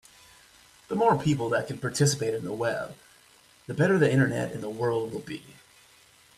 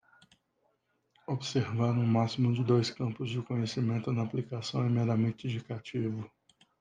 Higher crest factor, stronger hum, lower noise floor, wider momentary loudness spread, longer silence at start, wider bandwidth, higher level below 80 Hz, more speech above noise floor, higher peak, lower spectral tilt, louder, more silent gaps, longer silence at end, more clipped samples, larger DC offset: about the same, 20 dB vs 16 dB; neither; second, -58 dBFS vs -76 dBFS; first, 14 LU vs 10 LU; second, 0.9 s vs 1.3 s; first, 14 kHz vs 9 kHz; first, -62 dBFS vs -70 dBFS; second, 32 dB vs 45 dB; first, -8 dBFS vs -14 dBFS; second, -5.5 dB/octave vs -7 dB/octave; first, -27 LUFS vs -32 LUFS; neither; first, 0.85 s vs 0.55 s; neither; neither